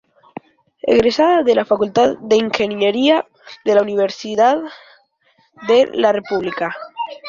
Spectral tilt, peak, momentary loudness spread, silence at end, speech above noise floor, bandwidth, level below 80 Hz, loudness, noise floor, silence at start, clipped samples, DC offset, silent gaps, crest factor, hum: -5 dB/octave; -2 dBFS; 11 LU; 0 s; 44 dB; 7.4 kHz; -54 dBFS; -16 LUFS; -59 dBFS; 0.85 s; under 0.1%; under 0.1%; none; 16 dB; none